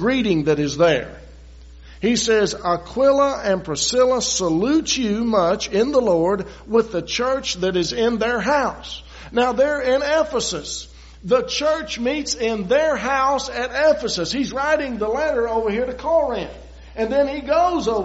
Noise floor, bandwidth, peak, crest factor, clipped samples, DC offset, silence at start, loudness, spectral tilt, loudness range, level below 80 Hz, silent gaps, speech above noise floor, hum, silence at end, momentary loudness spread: -41 dBFS; 8 kHz; -4 dBFS; 14 dB; under 0.1%; under 0.1%; 0 s; -20 LUFS; -3 dB/octave; 3 LU; -42 dBFS; none; 22 dB; none; 0 s; 7 LU